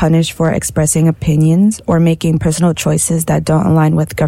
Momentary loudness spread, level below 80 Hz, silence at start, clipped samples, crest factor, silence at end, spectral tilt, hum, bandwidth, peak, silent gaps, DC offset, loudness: 3 LU; -36 dBFS; 0 s; under 0.1%; 10 dB; 0 s; -6 dB/octave; none; 14.5 kHz; -2 dBFS; none; under 0.1%; -13 LUFS